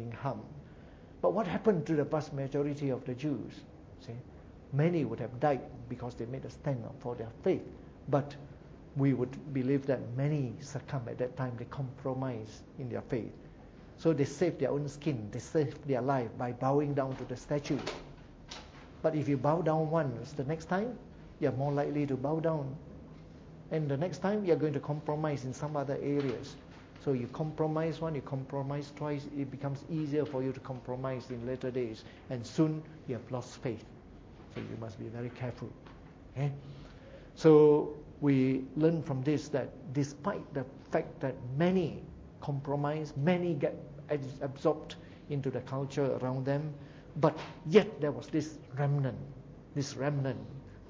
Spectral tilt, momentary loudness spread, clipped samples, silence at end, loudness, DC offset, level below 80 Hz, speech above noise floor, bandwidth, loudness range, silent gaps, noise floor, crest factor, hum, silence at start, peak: -7.5 dB/octave; 18 LU; under 0.1%; 0 s; -34 LUFS; under 0.1%; -60 dBFS; 20 dB; 7.8 kHz; 7 LU; none; -52 dBFS; 24 dB; none; 0 s; -10 dBFS